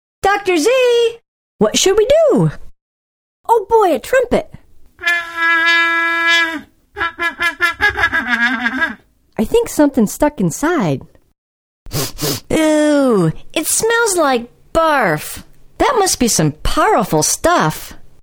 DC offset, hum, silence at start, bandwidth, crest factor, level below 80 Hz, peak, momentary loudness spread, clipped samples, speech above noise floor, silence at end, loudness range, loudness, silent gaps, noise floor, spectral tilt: under 0.1%; none; 0.25 s; over 20 kHz; 16 dB; -36 dBFS; 0 dBFS; 9 LU; under 0.1%; over 76 dB; 0.15 s; 3 LU; -14 LUFS; 1.28-1.59 s, 2.81-3.44 s, 11.38-11.86 s; under -90 dBFS; -3.5 dB/octave